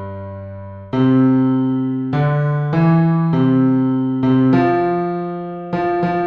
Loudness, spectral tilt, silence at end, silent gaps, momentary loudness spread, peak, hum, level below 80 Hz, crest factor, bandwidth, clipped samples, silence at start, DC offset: -16 LUFS; -10.5 dB/octave; 0 s; none; 14 LU; -4 dBFS; none; -50 dBFS; 12 dB; 5.2 kHz; under 0.1%; 0 s; under 0.1%